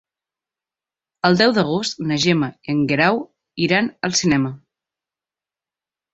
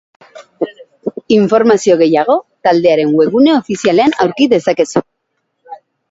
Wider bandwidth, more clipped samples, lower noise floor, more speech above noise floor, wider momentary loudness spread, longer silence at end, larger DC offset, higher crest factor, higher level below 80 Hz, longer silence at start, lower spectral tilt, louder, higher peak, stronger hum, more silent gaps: about the same, 8.2 kHz vs 8 kHz; neither; first, -90 dBFS vs -69 dBFS; first, 72 dB vs 58 dB; second, 8 LU vs 13 LU; first, 1.55 s vs 0.35 s; neither; first, 20 dB vs 12 dB; about the same, -56 dBFS vs -56 dBFS; first, 1.25 s vs 0.35 s; about the same, -4.5 dB/octave vs -5.5 dB/octave; second, -19 LUFS vs -12 LUFS; about the same, -2 dBFS vs 0 dBFS; neither; neither